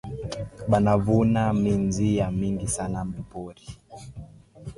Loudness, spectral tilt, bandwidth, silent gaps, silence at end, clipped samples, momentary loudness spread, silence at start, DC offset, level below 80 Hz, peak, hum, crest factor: -24 LUFS; -7 dB/octave; 11.5 kHz; none; 0.05 s; under 0.1%; 22 LU; 0.05 s; under 0.1%; -44 dBFS; -8 dBFS; none; 18 dB